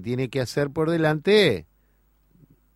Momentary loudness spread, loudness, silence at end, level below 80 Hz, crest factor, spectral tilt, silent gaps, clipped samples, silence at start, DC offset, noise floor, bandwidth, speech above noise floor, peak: 8 LU; -22 LUFS; 1.15 s; -58 dBFS; 18 dB; -6 dB/octave; none; under 0.1%; 0 s; under 0.1%; -63 dBFS; 13.5 kHz; 41 dB; -6 dBFS